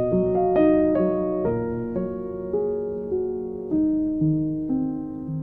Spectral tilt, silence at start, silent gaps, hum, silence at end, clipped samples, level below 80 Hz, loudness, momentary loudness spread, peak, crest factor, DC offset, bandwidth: -12.5 dB/octave; 0 s; none; none; 0 s; under 0.1%; -46 dBFS; -24 LUFS; 10 LU; -8 dBFS; 16 dB; under 0.1%; 3.3 kHz